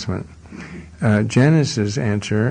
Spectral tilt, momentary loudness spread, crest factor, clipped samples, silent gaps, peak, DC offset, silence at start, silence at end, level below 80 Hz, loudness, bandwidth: -6.5 dB/octave; 21 LU; 16 dB; under 0.1%; none; -4 dBFS; under 0.1%; 0 s; 0 s; -46 dBFS; -18 LUFS; 9.8 kHz